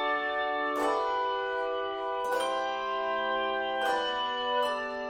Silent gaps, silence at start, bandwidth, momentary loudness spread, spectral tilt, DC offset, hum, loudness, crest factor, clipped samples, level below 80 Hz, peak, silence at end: none; 0 s; 16 kHz; 3 LU; -2 dB/octave; under 0.1%; none; -30 LUFS; 14 dB; under 0.1%; -64 dBFS; -16 dBFS; 0 s